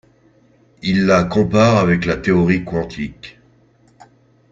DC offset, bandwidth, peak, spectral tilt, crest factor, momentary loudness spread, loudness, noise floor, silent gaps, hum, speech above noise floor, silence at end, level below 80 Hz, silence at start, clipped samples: under 0.1%; 7.6 kHz; 0 dBFS; -7 dB/octave; 18 dB; 14 LU; -16 LUFS; -53 dBFS; none; none; 38 dB; 1.2 s; -44 dBFS; 0.85 s; under 0.1%